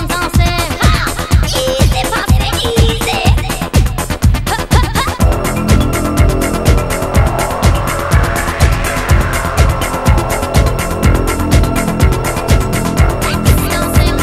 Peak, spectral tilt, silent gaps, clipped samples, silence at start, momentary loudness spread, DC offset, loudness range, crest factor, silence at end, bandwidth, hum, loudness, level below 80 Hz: 0 dBFS; -5 dB/octave; none; under 0.1%; 0 s; 2 LU; under 0.1%; 1 LU; 12 dB; 0 s; 16 kHz; none; -13 LUFS; -16 dBFS